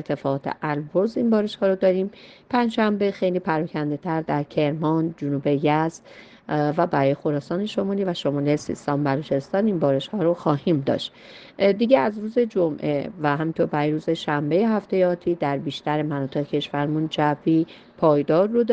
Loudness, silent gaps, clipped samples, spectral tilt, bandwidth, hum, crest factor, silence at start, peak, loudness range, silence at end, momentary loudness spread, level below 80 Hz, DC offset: -23 LUFS; none; under 0.1%; -7.5 dB/octave; 9 kHz; none; 18 dB; 0 s; -4 dBFS; 2 LU; 0 s; 6 LU; -62 dBFS; under 0.1%